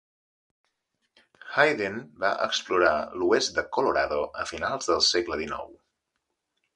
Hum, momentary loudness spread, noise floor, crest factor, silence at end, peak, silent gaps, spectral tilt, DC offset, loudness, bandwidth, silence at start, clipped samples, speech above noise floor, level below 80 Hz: none; 9 LU; -81 dBFS; 22 dB; 1.05 s; -6 dBFS; none; -2.5 dB/octave; under 0.1%; -25 LUFS; 11 kHz; 1.45 s; under 0.1%; 55 dB; -58 dBFS